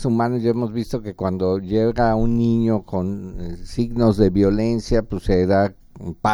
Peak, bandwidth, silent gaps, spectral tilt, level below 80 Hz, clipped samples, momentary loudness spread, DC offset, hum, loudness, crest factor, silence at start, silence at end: -2 dBFS; 12 kHz; none; -8 dB/octave; -32 dBFS; under 0.1%; 11 LU; under 0.1%; none; -20 LUFS; 16 dB; 0 s; 0 s